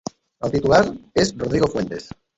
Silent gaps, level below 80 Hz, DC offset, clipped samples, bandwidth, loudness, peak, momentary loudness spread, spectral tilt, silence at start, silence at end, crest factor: none; -44 dBFS; under 0.1%; under 0.1%; 8.2 kHz; -20 LUFS; -2 dBFS; 13 LU; -5.5 dB/octave; 0.4 s; 0.3 s; 20 dB